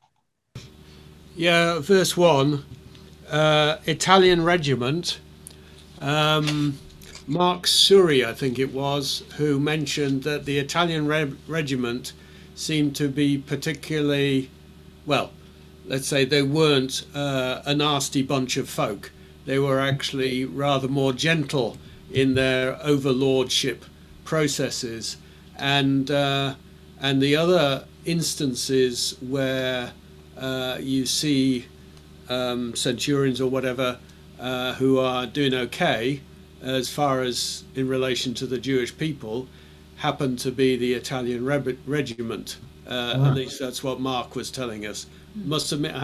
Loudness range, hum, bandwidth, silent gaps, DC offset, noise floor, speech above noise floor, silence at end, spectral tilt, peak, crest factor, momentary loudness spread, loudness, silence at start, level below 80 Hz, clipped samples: 6 LU; none; 14.5 kHz; none; under 0.1%; -72 dBFS; 49 dB; 0 s; -4.5 dB/octave; -2 dBFS; 22 dB; 12 LU; -23 LUFS; 0.55 s; -52 dBFS; under 0.1%